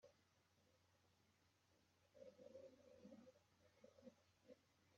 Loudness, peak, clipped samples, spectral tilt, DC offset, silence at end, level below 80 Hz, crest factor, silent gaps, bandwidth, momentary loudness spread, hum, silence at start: -67 LUFS; -50 dBFS; under 0.1%; -5 dB/octave; under 0.1%; 0 s; under -90 dBFS; 18 dB; none; 7.2 kHz; 5 LU; none; 0 s